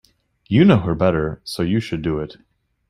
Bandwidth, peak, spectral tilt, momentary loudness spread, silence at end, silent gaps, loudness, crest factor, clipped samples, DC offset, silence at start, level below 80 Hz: 13 kHz; -2 dBFS; -7.5 dB/octave; 12 LU; 0.6 s; none; -19 LUFS; 18 dB; under 0.1%; under 0.1%; 0.5 s; -44 dBFS